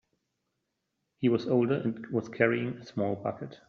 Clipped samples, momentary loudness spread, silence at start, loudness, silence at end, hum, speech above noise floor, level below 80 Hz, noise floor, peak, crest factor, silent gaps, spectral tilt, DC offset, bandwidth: under 0.1%; 8 LU; 1.2 s; -30 LUFS; 0.15 s; none; 53 dB; -72 dBFS; -82 dBFS; -8 dBFS; 22 dB; none; -6.5 dB/octave; under 0.1%; 6.8 kHz